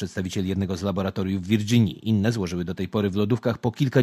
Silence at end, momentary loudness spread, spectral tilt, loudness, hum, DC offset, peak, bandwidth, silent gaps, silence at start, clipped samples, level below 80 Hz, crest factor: 0 s; 6 LU; -7 dB/octave; -25 LUFS; none; under 0.1%; -6 dBFS; 15.5 kHz; none; 0 s; under 0.1%; -44 dBFS; 18 dB